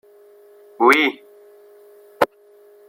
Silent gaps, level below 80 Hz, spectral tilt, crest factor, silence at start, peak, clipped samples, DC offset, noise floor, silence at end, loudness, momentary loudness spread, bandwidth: none; -70 dBFS; -3 dB/octave; 22 dB; 0.8 s; -2 dBFS; under 0.1%; under 0.1%; -50 dBFS; 0.65 s; -18 LUFS; 9 LU; 16.5 kHz